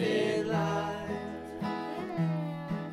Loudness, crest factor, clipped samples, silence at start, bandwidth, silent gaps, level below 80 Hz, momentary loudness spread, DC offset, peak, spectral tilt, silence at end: -33 LUFS; 14 dB; under 0.1%; 0 s; 12.5 kHz; none; -62 dBFS; 8 LU; under 0.1%; -18 dBFS; -6.5 dB/octave; 0 s